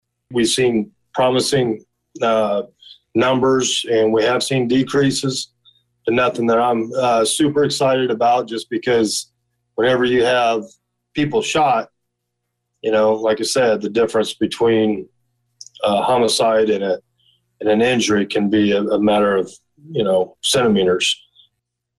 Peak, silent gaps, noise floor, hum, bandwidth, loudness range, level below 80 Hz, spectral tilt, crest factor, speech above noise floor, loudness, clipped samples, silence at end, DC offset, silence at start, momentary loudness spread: -8 dBFS; none; -76 dBFS; 60 Hz at -55 dBFS; 12.5 kHz; 2 LU; -56 dBFS; -4 dB/octave; 10 dB; 60 dB; -17 LUFS; under 0.1%; 0.85 s; under 0.1%; 0.3 s; 9 LU